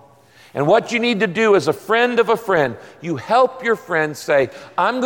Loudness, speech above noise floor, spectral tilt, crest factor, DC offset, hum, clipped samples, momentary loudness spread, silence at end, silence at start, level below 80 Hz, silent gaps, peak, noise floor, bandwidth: -18 LUFS; 31 dB; -5 dB/octave; 14 dB; under 0.1%; none; under 0.1%; 8 LU; 0 s; 0.55 s; -62 dBFS; none; -4 dBFS; -48 dBFS; 17 kHz